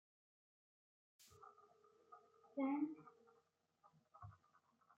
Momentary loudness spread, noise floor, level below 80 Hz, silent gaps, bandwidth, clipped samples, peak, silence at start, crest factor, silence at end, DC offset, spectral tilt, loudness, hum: 24 LU; -81 dBFS; -88 dBFS; none; 7.4 kHz; under 0.1%; -30 dBFS; 1.2 s; 22 dB; 0.65 s; under 0.1%; -6.5 dB/octave; -45 LUFS; none